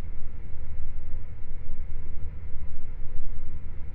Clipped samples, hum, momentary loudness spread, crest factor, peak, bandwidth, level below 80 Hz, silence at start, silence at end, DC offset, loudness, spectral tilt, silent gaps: under 0.1%; none; 3 LU; 10 dB; -10 dBFS; 2.2 kHz; -30 dBFS; 0 s; 0 s; under 0.1%; -41 LUFS; -10 dB/octave; none